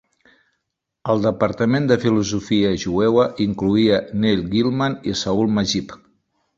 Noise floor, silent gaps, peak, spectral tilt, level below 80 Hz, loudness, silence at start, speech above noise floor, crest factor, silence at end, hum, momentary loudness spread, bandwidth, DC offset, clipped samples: -78 dBFS; none; -2 dBFS; -6 dB/octave; -48 dBFS; -19 LUFS; 1.05 s; 59 dB; 18 dB; 0.6 s; none; 5 LU; 7.6 kHz; under 0.1%; under 0.1%